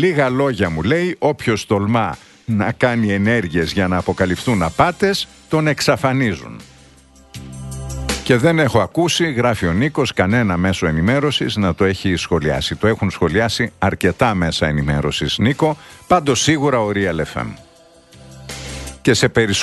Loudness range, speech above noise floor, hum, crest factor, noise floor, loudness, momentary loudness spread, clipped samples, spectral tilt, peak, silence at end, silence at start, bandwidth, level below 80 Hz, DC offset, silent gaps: 3 LU; 31 dB; none; 18 dB; -47 dBFS; -17 LUFS; 11 LU; under 0.1%; -5 dB/octave; 0 dBFS; 0 s; 0 s; 12.5 kHz; -38 dBFS; under 0.1%; none